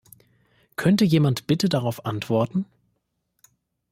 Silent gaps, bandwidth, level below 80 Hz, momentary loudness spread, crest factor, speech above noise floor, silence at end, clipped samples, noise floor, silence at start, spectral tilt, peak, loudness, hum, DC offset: none; 16 kHz; -60 dBFS; 11 LU; 18 dB; 53 dB; 1.25 s; under 0.1%; -74 dBFS; 0.8 s; -6.5 dB/octave; -6 dBFS; -22 LUFS; none; under 0.1%